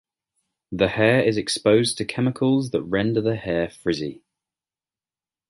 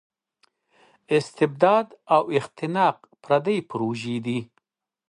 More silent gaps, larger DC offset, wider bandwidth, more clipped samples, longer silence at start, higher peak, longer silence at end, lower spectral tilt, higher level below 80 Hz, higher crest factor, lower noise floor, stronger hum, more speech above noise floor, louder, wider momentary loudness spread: neither; neither; about the same, 11.5 kHz vs 11 kHz; neither; second, 0.7 s vs 1.1 s; about the same, -4 dBFS vs -6 dBFS; first, 1.35 s vs 0.65 s; about the same, -5.5 dB/octave vs -6.5 dB/octave; first, -52 dBFS vs -72 dBFS; about the same, 20 dB vs 20 dB; first, under -90 dBFS vs -72 dBFS; neither; first, over 69 dB vs 49 dB; about the same, -22 LUFS vs -23 LUFS; about the same, 8 LU vs 9 LU